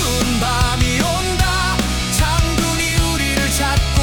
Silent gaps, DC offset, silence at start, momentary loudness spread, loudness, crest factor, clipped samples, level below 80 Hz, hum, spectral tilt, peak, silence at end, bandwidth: none; under 0.1%; 0 s; 1 LU; -17 LUFS; 14 dB; under 0.1%; -22 dBFS; none; -3.5 dB/octave; -4 dBFS; 0 s; 18 kHz